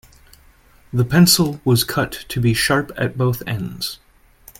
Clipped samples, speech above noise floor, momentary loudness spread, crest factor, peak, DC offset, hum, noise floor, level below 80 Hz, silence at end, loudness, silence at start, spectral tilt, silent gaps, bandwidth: under 0.1%; 33 dB; 13 LU; 20 dB; 0 dBFS; under 0.1%; none; -50 dBFS; -44 dBFS; 0.65 s; -18 LUFS; 0.95 s; -4.5 dB/octave; none; 17 kHz